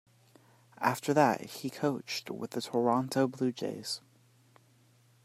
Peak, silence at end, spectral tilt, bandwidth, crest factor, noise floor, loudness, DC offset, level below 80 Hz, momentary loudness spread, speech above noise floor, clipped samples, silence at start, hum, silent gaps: -10 dBFS; 1.25 s; -5 dB/octave; 16 kHz; 22 dB; -64 dBFS; -32 LUFS; under 0.1%; -80 dBFS; 11 LU; 33 dB; under 0.1%; 0.8 s; none; none